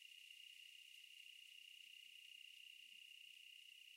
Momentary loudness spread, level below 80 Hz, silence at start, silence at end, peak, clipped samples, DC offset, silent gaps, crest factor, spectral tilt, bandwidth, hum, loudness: 1 LU; under -90 dBFS; 0 s; 0 s; -48 dBFS; under 0.1%; under 0.1%; none; 14 dB; 5.5 dB/octave; 16 kHz; none; -59 LUFS